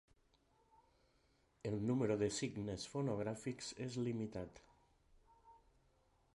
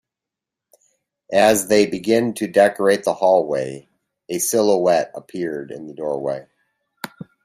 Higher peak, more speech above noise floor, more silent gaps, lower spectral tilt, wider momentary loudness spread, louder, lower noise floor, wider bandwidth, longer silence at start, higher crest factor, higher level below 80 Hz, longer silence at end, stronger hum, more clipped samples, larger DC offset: second, -26 dBFS vs -2 dBFS; second, 35 dB vs 68 dB; neither; first, -5.5 dB/octave vs -4 dB/octave; second, 9 LU vs 17 LU; second, -42 LUFS vs -19 LUFS; second, -76 dBFS vs -86 dBFS; second, 11.5 kHz vs 15.5 kHz; first, 1.65 s vs 1.3 s; about the same, 18 dB vs 18 dB; second, -70 dBFS vs -62 dBFS; first, 0.8 s vs 0.2 s; neither; neither; neither